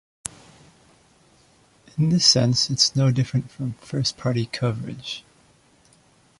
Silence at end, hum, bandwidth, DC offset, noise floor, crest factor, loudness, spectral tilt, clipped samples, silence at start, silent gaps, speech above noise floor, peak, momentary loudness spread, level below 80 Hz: 1.2 s; none; 11.5 kHz; under 0.1%; -58 dBFS; 22 dB; -21 LUFS; -4 dB/octave; under 0.1%; 1.95 s; none; 36 dB; -4 dBFS; 20 LU; -56 dBFS